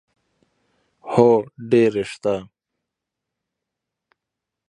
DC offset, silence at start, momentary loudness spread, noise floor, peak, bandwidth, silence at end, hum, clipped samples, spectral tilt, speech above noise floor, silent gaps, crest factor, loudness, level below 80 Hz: under 0.1%; 1.05 s; 11 LU; -84 dBFS; -2 dBFS; 10.5 kHz; 2.25 s; none; under 0.1%; -7 dB/octave; 66 dB; none; 22 dB; -19 LUFS; -62 dBFS